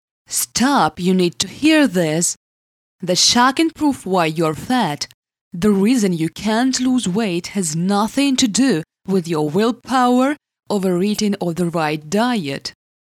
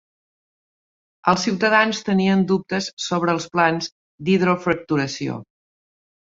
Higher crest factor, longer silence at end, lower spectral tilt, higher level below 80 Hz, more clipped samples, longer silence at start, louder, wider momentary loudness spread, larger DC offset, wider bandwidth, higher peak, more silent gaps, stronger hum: about the same, 16 dB vs 20 dB; second, 0.35 s vs 0.75 s; about the same, -4 dB/octave vs -5 dB/octave; first, -54 dBFS vs -60 dBFS; neither; second, 0.3 s vs 1.25 s; first, -17 LUFS vs -20 LUFS; about the same, 8 LU vs 10 LU; neither; first, 16 kHz vs 7.8 kHz; about the same, -2 dBFS vs -2 dBFS; first, 2.36-2.99 s, 5.14-5.23 s, 5.41-5.51 s vs 2.93-2.97 s, 3.92-4.18 s; neither